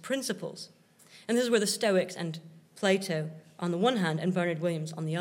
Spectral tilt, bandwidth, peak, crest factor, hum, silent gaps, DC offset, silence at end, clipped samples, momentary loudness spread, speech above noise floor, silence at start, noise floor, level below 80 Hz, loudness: -5 dB/octave; 16 kHz; -12 dBFS; 18 dB; none; none; under 0.1%; 0 s; under 0.1%; 14 LU; 28 dB; 0.05 s; -57 dBFS; -88 dBFS; -30 LUFS